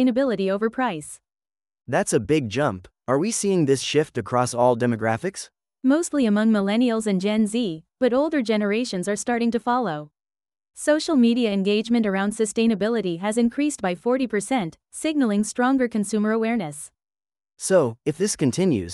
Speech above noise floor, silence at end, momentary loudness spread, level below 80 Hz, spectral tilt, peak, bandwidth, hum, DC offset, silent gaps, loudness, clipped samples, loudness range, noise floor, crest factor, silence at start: over 68 dB; 0 s; 7 LU; -60 dBFS; -5 dB/octave; -6 dBFS; 13 kHz; none; under 0.1%; none; -22 LUFS; under 0.1%; 2 LU; under -90 dBFS; 16 dB; 0 s